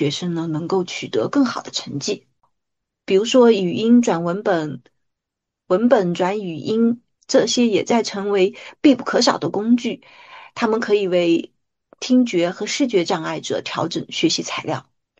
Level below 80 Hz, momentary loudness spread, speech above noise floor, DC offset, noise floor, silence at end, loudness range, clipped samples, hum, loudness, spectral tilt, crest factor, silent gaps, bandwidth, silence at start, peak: -66 dBFS; 10 LU; 64 dB; under 0.1%; -83 dBFS; 0.4 s; 2 LU; under 0.1%; none; -19 LUFS; -4.5 dB/octave; 18 dB; none; 8.4 kHz; 0 s; -2 dBFS